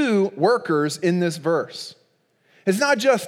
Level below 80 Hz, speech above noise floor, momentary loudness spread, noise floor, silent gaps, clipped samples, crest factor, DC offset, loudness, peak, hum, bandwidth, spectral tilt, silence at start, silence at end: -80 dBFS; 43 dB; 12 LU; -64 dBFS; none; under 0.1%; 16 dB; under 0.1%; -21 LUFS; -4 dBFS; none; 16.5 kHz; -5 dB/octave; 0 s; 0 s